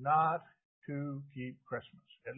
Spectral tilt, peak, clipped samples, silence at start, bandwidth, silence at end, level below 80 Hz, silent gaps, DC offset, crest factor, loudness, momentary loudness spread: -3 dB/octave; -18 dBFS; under 0.1%; 0 s; 3.8 kHz; 0 s; -76 dBFS; 0.65-0.82 s; under 0.1%; 18 dB; -37 LUFS; 21 LU